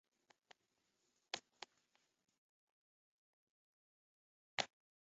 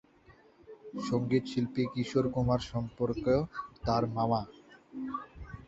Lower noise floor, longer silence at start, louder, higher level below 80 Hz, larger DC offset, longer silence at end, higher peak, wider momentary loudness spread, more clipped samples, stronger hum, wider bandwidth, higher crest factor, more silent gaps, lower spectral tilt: first, -85 dBFS vs -60 dBFS; first, 1.35 s vs 0.3 s; second, -47 LUFS vs -32 LUFS; second, under -90 dBFS vs -52 dBFS; neither; first, 0.45 s vs 0.05 s; second, -20 dBFS vs -14 dBFS; about the same, 14 LU vs 14 LU; neither; neither; about the same, 7.4 kHz vs 8 kHz; first, 38 dB vs 18 dB; first, 2.38-4.58 s vs none; second, 1 dB/octave vs -7.5 dB/octave